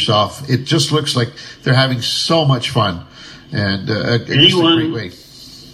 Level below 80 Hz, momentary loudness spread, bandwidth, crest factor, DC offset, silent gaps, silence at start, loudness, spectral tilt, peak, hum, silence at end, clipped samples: -52 dBFS; 16 LU; 13 kHz; 16 dB; under 0.1%; none; 0 s; -15 LUFS; -5 dB/octave; 0 dBFS; none; 0 s; under 0.1%